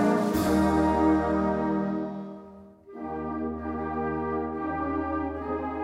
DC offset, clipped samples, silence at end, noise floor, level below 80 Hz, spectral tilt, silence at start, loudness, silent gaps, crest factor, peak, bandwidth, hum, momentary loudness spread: under 0.1%; under 0.1%; 0 s; -48 dBFS; -46 dBFS; -7 dB/octave; 0 s; -27 LUFS; none; 14 dB; -12 dBFS; 16 kHz; none; 13 LU